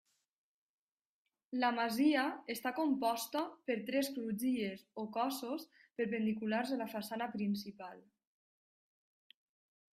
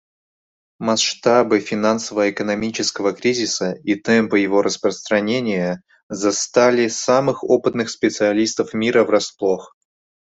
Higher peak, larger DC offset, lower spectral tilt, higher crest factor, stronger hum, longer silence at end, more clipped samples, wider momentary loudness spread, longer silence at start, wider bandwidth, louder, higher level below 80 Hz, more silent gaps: second, -20 dBFS vs 0 dBFS; neither; about the same, -4.5 dB/octave vs -3.5 dB/octave; about the same, 18 dB vs 18 dB; neither; first, 1.95 s vs 0.6 s; neither; first, 11 LU vs 7 LU; first, 1.5 s vs 0.8 s; first, 16 kHz vs 8.2 kHz; second, -37 LUFS vs -18 LUFS; second, -82 dBFS vs -60 dBFS; second, none vs 6.03-6.09 s